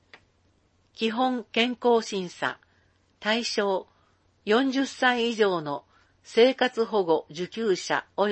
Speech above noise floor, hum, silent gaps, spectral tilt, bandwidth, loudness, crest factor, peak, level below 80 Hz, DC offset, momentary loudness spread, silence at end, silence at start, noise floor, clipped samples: 41 dB; none; none; -4 dB/octave; 8.6 kHz; -26 LUFS; 20 dB; -6 dBFS; -72 dBFS; under 0.1%; 10 LU; 0 s; 0.95 s; -66 dBFS; under 0.1%